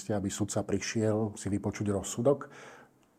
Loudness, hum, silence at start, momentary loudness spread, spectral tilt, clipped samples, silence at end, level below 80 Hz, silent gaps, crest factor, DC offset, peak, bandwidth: -32 LUFS; none; 0 s; 10 LU; -5.5 dB/octave; under 0.1%; 0.35 s; -64 dBFS; none; 18 dB; under 0.1%; -14 dBFS; 15.5 kHz